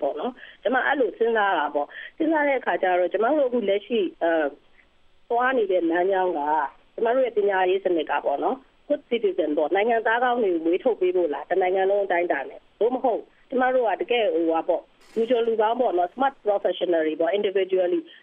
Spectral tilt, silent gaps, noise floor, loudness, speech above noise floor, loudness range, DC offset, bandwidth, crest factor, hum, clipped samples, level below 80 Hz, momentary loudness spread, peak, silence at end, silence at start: -7 dB/octave; none; -57 dBFS; -23 LUFS; 34 dB; 1 LU; under 0.1%; 3.9 kHz; 14 dB; none; under 0.1%; -64 dBFS; 7 LU; -8 dBFS; 0.1 s; 0 s